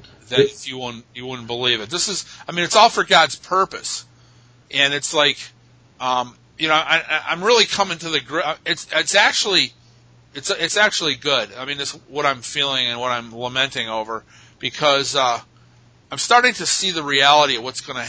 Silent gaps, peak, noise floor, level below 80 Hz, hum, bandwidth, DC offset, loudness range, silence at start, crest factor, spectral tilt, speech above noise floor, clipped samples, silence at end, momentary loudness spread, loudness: none; 0 dBFS; -51 dBFS; -60 dBFS; none; 8 kHz; under 0.1%; 4 LU; 0.3 s; 20 dB; -1.5 dB/octave; 32 dB; under 0.1%; 0 s; 14 LU; -18 LUFS